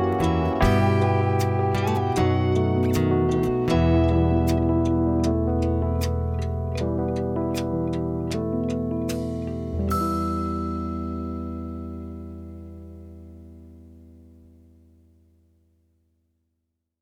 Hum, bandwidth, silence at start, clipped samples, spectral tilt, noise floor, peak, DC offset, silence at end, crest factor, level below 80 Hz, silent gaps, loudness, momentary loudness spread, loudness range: none; 16 kHz; 0 s; under 0.1%; -7.5 dB/octave; -78 dBFS; -8 dBFS; under 0.1%; 2.85 s; 16 dB; -36 dBFS; none; -24 LUFS; 16 LU; 15 LU